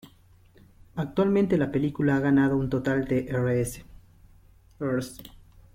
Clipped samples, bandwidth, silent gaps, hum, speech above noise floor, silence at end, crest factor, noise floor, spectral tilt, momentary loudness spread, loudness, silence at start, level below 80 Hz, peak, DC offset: under 0.1%; 16.5 kHz; none; none; 32 dB; 0.45 s; 16 dB; -56 dBFS; -7.5 dB/octave; 13 LU; -26 LUFS; 0.05 s; -50 dBFS; -12 dBFS; under 0.1%